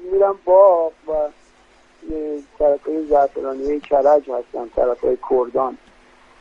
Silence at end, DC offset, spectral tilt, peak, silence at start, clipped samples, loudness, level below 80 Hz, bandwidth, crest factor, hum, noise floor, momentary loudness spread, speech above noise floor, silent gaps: 0.65 s; under 0.1%; -7.5 dB/octave; -2 dBFS; 0 s; under 0.1%; -18 LUFS; -46 dBFS; 6.6 kHz; 16 dB; none; -52 dBFS; 14 LU; 34 dB; none